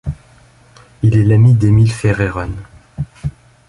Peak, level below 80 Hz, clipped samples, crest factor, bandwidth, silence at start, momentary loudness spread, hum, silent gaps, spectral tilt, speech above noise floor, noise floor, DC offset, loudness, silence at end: 0 dBFS; -34 dBFS; under 0.1%; 14 dB; 11.5 kHz; 0.05 s; 19 LU; none; none; -8 dB/octave; 35 dB; -46 dBFS; under 0.1%; -13 LUFS; 0.4 s